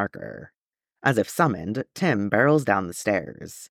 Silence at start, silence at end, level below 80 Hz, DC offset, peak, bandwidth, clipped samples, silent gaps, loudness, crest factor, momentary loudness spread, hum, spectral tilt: 0 s; 0.05 s; -62 dBFS; under 0.1%; -6 dBFS; 17.5 kHz; under 0.1%; 0.61-0.73 s; -23 LUFS; 20 dB; 19 LU; none; -6 dB/octave